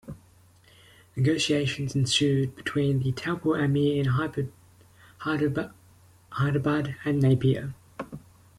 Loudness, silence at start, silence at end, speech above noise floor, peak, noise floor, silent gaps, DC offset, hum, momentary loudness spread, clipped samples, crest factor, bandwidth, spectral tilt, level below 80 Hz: -26 LUFS; 0.05 s; 0.4 s; 32 dB; -12 dBFS; -57 dBFS; none; under 0.1%; none; 17 LU; under 0.1%; 16 dB; 12.5 kHz; -6 dB/octave; -56 dBFS